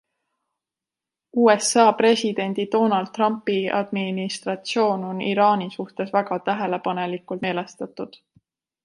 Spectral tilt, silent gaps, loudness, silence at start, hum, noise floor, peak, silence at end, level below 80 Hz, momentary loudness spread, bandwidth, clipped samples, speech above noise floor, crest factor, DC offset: -4.5 dB/octave; none; -22 LUFS; 1.35 s; none; -88 dBFS; -2 dBFS; 0.8 s; -72 dBFS; 12 LU; 11.5 kHz; under 0.1%; 67 dB; 20 dB; under 0.1%